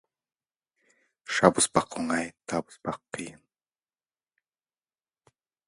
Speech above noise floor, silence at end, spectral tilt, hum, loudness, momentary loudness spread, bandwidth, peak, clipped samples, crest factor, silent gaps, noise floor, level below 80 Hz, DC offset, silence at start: over 63 dB; 2.35 s; -3.5 dB/octave; none; -27 LUFS; 17 LU; 11.5 kHz; -2 dBFS; under 0.1%; 30 dB; none; under -90 dBFS; -64 dBFS; under 0.1%; 1.3 s